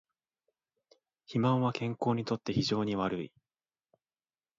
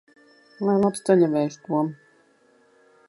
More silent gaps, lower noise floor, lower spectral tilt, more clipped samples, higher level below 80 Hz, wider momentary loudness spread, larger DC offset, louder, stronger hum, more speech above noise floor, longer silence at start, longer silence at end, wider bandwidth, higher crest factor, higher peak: neither; first, under -90 dBFS vs -60 dBFS; about the same, -6.5 dB/octave vs -7 dB/octave; neither; about the same, -66 dBFS vs -68 dBFS; about the same, 8 LU vs 8 LU; neither; second, -32 LUFS vs -23 LUFS; neither; first, over 59 dB vs 38 dB; first, 1.3 s vs 0.6 s; first, 1.3 s vs 1.15 s; second, 7.8 kHz vs 11.5 kHz; about the same, 18 dB vs 20 dB; second, -16 dBFS vs -6 dBFS